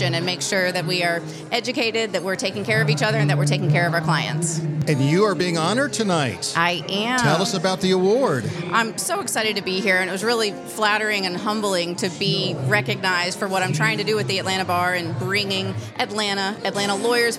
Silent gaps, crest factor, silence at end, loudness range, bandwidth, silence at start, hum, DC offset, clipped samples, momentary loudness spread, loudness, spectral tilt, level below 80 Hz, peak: none; 18 dB; 0 s; 2 LU; 15 kHz; 0 s; none; under 0.1%; under 0.1%; 5 LU; -21 LUFS; -4 dB/octave; -64 dBFS; -4 dBFS